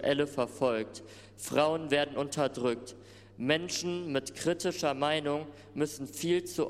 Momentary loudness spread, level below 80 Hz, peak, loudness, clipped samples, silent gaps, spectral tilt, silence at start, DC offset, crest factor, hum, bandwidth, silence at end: 13 LU; -66 dBFS; -12 dBFS; -32 LUFS; under 0.1%; none; -4 dB/octave; 0 s; under 0.1%; 20 dB; 50 Hz at -55 dBFS; 15.5 kHz; 0 s